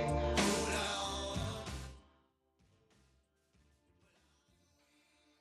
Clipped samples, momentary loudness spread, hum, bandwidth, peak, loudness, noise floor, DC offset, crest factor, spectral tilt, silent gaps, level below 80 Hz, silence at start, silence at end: under 0.1%; 14 LU; none; 13.5 kHz; -20 dBFS; -36 LUFS; -74 dBFS; under 0.1%; 22 dB; -4 dB/octave; none; -50 dBFS; 0 s; 3.4 s